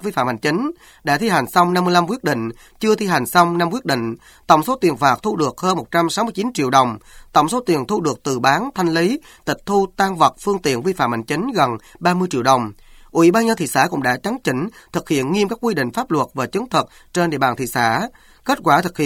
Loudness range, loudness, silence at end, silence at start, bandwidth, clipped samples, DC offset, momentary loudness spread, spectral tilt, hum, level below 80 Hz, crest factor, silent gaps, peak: 2 LU; -18 LUFS; 0 s; 0 s; 18 kHz; under 0.1%; under 0.1%; 8 LU; -5 dB/octave; none; -52 dBFS; 18 dB; none; 0 dBFS